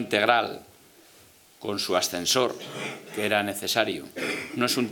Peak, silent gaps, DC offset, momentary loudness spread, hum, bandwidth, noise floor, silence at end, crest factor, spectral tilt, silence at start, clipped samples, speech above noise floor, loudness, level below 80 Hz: -2 dBFS; none; under 0.1%; 12 LU; none; 19.5 kHz; -55 dBFS; 0 s; 24 dB; -2.5 dB/octave; 0 s; under 0.1%; 28 dB; -26 LUFS; -72 dBFS